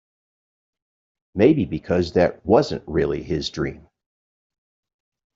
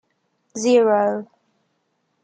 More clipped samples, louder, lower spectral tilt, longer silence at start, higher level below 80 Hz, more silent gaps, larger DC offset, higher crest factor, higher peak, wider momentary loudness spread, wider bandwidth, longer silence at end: neither; about the same, -21 LUFS vs -19 LUFS; first, -7 dB/octave vs -4.5 dB/octave; first, 1.35 s vs 0.55 s; first, -48 dBFS vs -78 dBFS; neither; neither; about the same, 20 dB vs 16 dB; first, -2 dBFS vs -6 dBFS; second, 10 LU vs 15 LU; second, 7.8 kHz vs 9.2 kHz; first, 1.6 s vs 1 s